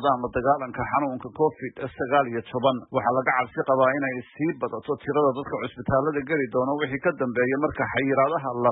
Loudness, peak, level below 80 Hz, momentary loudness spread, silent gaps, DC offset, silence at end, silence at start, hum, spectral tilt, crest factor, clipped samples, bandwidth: -25 LUFS; -8 dBFS; -54 dBFS; 8 LU; none; under 0.1%; 0 s; 0 s; none; -11 dB/octave; 16 dB; under 0.1%; 4 kHz